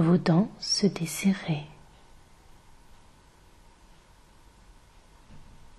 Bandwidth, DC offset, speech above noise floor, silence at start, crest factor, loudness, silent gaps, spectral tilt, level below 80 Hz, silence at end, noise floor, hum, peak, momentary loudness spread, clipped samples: 13 kHz; under 0.1%; 31 dB; 0 s; 20 dB; -26 LUFS; none; -5.5 dB/octave; -56 dBFS; 0.35 s; -56 dBFS; none; -10 dBFS; 11 LU; under 0.1%